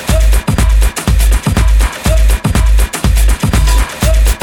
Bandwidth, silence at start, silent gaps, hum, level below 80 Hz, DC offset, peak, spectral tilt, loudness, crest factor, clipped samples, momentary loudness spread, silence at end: 17.5 kHz; 0 s; none; none; -10 dBFS; under 0.1%; 0 dBFS; -5 dB/octave; -12 LUFS; 8 dB; under 0.1%; 1 LU; 0 s